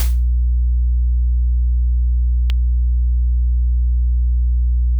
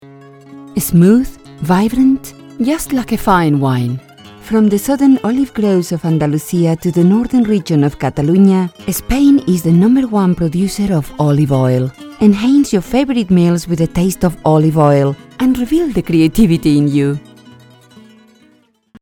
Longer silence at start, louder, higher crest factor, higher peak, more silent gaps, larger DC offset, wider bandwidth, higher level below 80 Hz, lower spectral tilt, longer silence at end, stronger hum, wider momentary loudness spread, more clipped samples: second, 0 s vs 0.5 s; second, -19 LUFS vs -13 LUFS; about the same, 8 dB vs 12 dB; second, -8 dBFS vs 0 dBFS; neither; neither; second, 3.6 kHz vs 18 kHz; first, -16 dBFS vs -34 dBFS; about the same, -6.5 dB/octave vs -7 dB/octave; second, 0 s vs 1.8 s; first, 60 Hz at -15 dBFS vs none; second, 0 LU vs 7 LU; neither